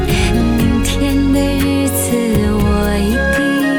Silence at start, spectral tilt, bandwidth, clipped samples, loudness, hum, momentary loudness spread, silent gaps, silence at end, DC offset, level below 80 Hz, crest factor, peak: 0 s; -5.5 dB/octave; 18 kHz; under 0.1%; -14 LUFS; none; 1 LU; none; 0 s; under 0.1%; -22 dBFS; 10 dB; -4 dBFS